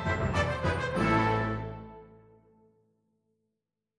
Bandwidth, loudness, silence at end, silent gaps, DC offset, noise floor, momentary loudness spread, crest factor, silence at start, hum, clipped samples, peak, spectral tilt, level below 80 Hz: 10 kHz; -29 LUFS; 1.85 s; none; under 0.1%; -85 dBFS; 16 LU; 18 dB; 0 s; none; under 0.1%; -14 dBFS; -6.5 dB/octave; -46 dBFS